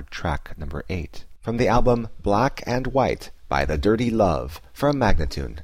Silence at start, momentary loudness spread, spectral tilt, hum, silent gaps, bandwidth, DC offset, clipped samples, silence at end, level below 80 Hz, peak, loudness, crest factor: 0 s; 12 LU; -6.5 dB/octave; none; none; 15 kHz; 0.5%; under 0.1%; 0 s; -30 dBFS; -8 dBFS; -23 LUFS; 14 dB